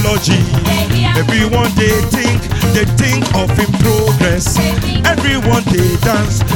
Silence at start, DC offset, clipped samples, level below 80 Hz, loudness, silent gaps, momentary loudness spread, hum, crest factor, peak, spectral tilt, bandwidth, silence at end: 0 s; under 0.1%; under 0.1%; -24 dBFS; -12 LUFS; none; 2 LU; none; 12 dB; 0 dBFS; -5 dB/octave; 17.5 kHz; 0 s